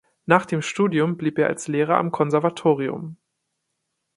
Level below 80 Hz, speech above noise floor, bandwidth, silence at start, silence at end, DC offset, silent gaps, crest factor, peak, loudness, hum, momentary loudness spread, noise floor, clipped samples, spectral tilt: -66 dBFS; 56 dB; 11.5 kHz; 0.3 s; 1 s; under 0.1%; none; 22 dB; 0 dBFS; -21 LUFS; none; 6 LU; -77 dBFS; under 0.1%; -6 dB/octave